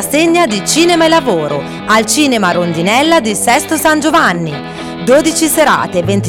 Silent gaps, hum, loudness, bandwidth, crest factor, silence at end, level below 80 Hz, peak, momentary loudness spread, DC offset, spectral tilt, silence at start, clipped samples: none; none; -10 LUFS; 17.5 kHz; 10 dB; 0 s; -44 dBFS; 0 dBFS; 9 LU; under 0.1%; -3.5 dB/octave; 0 s; under 0.1%